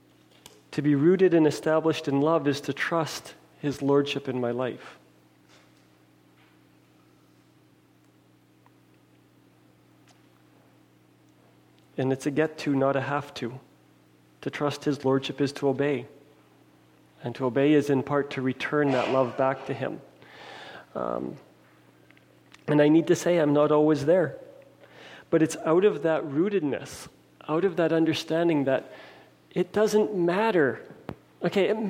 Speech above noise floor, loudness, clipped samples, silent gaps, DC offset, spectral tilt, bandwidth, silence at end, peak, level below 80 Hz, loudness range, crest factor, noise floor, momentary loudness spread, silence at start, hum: 35 dB; -25 LUFS; under 0.1%; none; under 0.1%; -6 dB/octave; 16 kHz; 0 s; -10 dBFS; -70 dBFS; 7 LU; 16 dB; -60 dBFS; 19 LU; 0.7 s; 60 Hz at -65 dBFS